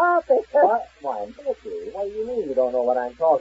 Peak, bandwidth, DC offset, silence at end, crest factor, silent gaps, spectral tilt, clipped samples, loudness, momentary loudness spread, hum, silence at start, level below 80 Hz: -6 dBFS; 7.8 kHz; under 0.1%; 0 s; 16 dB; none; -6.5 dB/octave; under 0.1%; -23 LUFS; 12 LU; none; 0 s; -58 dBFS